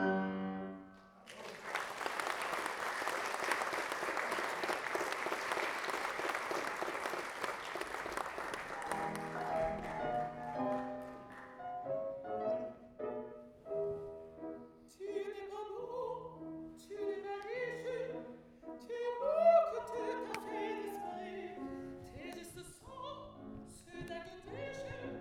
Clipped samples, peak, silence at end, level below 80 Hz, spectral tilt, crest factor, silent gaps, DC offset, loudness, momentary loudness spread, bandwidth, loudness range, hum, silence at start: under 0.1%; -18 dBFS; 0 s; -68 dBFS; -4 dB/octave; 22 dB; none; under 0.1%; -40 LUFS; 13 LU; 18.5 kHz; 9 LU; none; 0 s